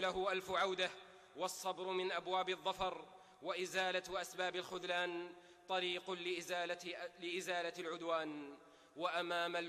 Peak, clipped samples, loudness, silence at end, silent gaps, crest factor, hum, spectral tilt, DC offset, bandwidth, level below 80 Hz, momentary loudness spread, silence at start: -26 dBFS; under 0.1%; -41 LUFS; 0 s; none; 16 dB; none; -2.5 dB/octave; under 0.1%; 14 kHz; -76 dBFS; 13 LU; 0 s